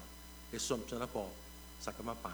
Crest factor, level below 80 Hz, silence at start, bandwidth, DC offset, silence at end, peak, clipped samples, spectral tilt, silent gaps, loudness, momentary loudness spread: 20 dB; -56 dBFS; 0 s; over 20 kHz; under 0.1%; 0 s; -22 dBFS; under 0.1%; -3.5 dB/octave; none; -42 LUFS; 14 LU